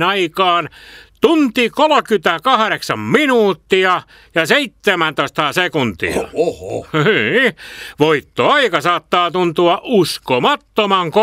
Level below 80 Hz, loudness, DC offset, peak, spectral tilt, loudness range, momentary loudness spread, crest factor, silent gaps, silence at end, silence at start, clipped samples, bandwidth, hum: -52 dBFS; -15 LUFS; under 0.1%; 0 dBFS; -4.5 dB/octave; 2 LU; 6 LU; 16 dB; none; 0 s; 0 s; under 0.1%; 16 kHz; none